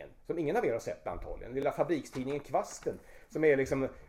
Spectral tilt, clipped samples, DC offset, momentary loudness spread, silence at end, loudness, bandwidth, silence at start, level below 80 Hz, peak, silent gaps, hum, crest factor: -6 dB/octave; under 0.1%; under 0.1%; 13 LU; 0.05 s; -33 LUFS; 15 kHz; 0 s; -54 dBFS; -14 dBFS; none; none; 18 dB